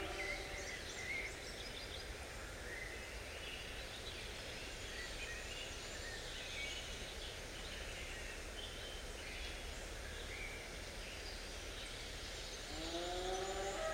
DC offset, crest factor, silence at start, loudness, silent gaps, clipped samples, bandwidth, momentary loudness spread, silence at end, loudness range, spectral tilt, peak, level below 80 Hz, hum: under 0.1%; 16 dB; 0 s; -46 LUFS; none; under 0.1%; 16 kHz; 5 LU; 0 s; 2 LU; -2.5 dB/octave; -30 dBFS; -54 dBFS; none